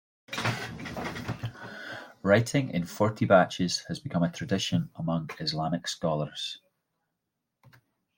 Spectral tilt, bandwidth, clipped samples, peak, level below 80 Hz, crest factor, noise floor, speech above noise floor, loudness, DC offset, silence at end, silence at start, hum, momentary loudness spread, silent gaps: -5 dB/octave; 16.5 kHz; under 0.1%; -6 dBFS; -62 dBFS; 24 dB; -84 dBFS; 56 dB; -29 LUFS; under 0.1%; 0.5 s; 0.3 s; none; 15 LU; none